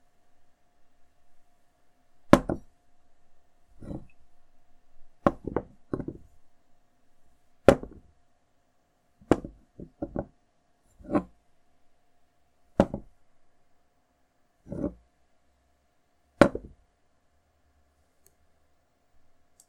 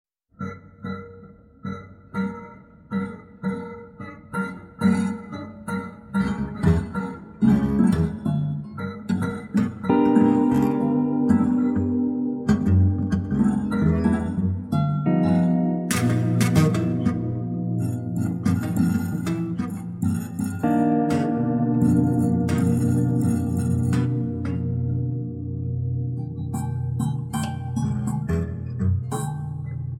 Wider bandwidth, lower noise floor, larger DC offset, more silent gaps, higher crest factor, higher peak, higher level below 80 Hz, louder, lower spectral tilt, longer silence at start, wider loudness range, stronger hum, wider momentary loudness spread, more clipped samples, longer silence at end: second, 14 kHz vs 16 kHz; first, -69 dBFS vs -46 dBFS; neither; neither; first, 32 dB vs 16 dB; first, 0 dBFS vs -6 dBFS; second, -50 dBFS vs -44 dBFS; second, -28 LUFS vs -23 LUFS; about the same, -7 dB/octave vs -8 dB/octave; first, 1.3 s vs 0.4 s; about the same, 6 LU vs 7 LU; neither; first, 24 LU vs 13 LU; neither; first, 3.1 s vs 0 s